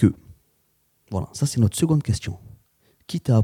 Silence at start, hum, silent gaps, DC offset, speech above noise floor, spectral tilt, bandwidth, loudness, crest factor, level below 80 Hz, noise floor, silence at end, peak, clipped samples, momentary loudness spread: 0 s; none; none; under 0.1%; 45 dB; -6.5 dB/octave; 15.5 kHz; -24 LUFS; 20 dB; -50 dBFS; -66 dBFS; 0 s; -4 dBFS; under 0.1%; 14 LU